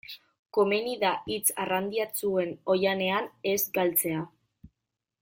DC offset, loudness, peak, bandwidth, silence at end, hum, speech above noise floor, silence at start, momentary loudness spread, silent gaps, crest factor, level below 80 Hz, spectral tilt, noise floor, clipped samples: under 0.1%; -28 LUFS; -10 dBFS; 17 kHz; 0.55 s; none; 58 dB; 0.1 s; 7 LU; 0.39-0.46 s; 18 dB; -66 dBFS; -3.5 dB/octave; -86 dBFS; under 0.1%